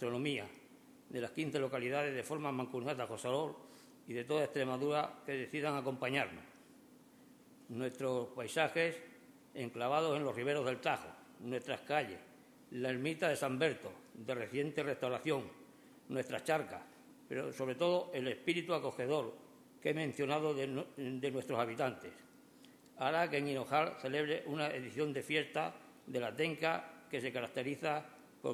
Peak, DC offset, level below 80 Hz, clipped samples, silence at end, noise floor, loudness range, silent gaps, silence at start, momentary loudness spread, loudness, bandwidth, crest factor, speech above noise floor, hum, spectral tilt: -18 dBFS; under 0.1%; -80 dBFS; under 0.1%; 0 s; -62 dBFS; 3 LU; none; 0 s; 12 LU; -38 LUFS; 20 kHz; 22 dB; 24 dB; none; -5 dB/octave